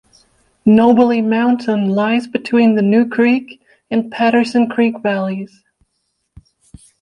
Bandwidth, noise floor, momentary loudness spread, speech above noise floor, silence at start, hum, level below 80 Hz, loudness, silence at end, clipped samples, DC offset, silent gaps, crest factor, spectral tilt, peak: 9.8 kHz; -69 dBFS; 9 LU; 56 dB; 0.65 s; none; -56 dBFS; -14 LUFS; 1.55 s; under 0.1%; under 0.1%; none; 14 dB; -7.5 dB/octave; -2 dBFS